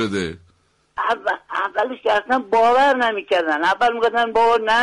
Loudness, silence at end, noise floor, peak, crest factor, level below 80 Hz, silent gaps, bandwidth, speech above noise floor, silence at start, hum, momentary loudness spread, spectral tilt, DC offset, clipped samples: -18 LUFS; 0 s; -60 dBFS; -8 dBFS; 10 dB; -54 dBFS; none; 11.5 kHz; 42 dB; 0 s; none; 8 LU; -4 dB/octave; under 0.1%; under 0.1%